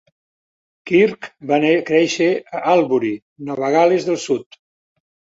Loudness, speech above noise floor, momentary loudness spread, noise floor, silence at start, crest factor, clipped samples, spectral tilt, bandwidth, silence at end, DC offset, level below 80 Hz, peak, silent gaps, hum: -17 LUFS; over 73 dB; 9 LU; under -90 dBFS; 0.85 s; 18 dB; under 0.1%; -5 dB/octave; 8 kHz; 0.9 s; under 0.1%; -64 dBFS; -2 dBFS; 3.22-3.36 s; none